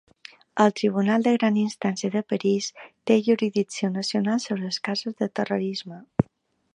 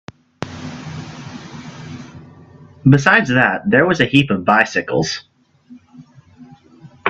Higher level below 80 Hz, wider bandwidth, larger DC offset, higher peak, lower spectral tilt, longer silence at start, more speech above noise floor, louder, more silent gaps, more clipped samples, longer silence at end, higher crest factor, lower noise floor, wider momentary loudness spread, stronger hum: second, -60 dBFS vs -52 dBFS; first, 10.5 kHz vs 8.4 kHz; neither; second, -4 dBFS vs 0 dBFS; about the same, -5.5 dB/octave vs -5.5 dB/octave; first, 0.55 s vs 0.4 s; first, 41 dB vs 31 dB; second, -25 LUFS vs -14 LUFS; neither; neither; first, 0.55 s vs 0 s; about the same, 20 dB vs 18 dB; first, -65 dBFS vs -45 dBFS; second, 9 LU vs 21 LU; neither